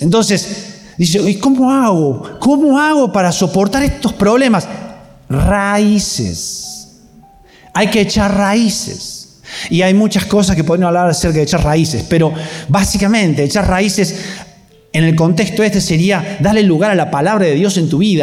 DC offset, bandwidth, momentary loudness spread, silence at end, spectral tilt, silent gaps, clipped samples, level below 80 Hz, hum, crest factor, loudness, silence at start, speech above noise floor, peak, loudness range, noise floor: under 0.1%; 15.5 kHz; 12 LU; 0 s; -5 dB/octave; none; under 0.1%; -32 dBFS; none; 10 dB; -13 LUFS; 0 s; 31 dB; -2 dBFS; 4 LU; -43 dBFS